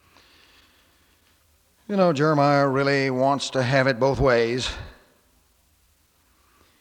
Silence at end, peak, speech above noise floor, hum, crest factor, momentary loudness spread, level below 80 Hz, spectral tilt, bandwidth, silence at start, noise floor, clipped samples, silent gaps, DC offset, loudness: 1.9 s; -6 dBFS; 42 dB; none; 18 dB; 8 LU; -46 dBFS; -5.5 dB/octave; 12.5 kHz; 1.9 s; -63 dBFS; under 0.1%; none; under 0.1%; -21 LUFS